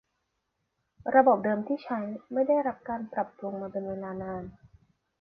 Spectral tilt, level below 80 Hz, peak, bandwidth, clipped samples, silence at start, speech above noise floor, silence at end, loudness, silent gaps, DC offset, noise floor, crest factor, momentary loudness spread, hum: -10 dB/octave; -64 dBFS; -6 dBFS; 5.4 kHz; under 0.1%; 1.05 s; 52 dB; 0.7 s; -29 LUFS; none; under 0.1%; -80 dBFS; 24 dB; 15 LU; none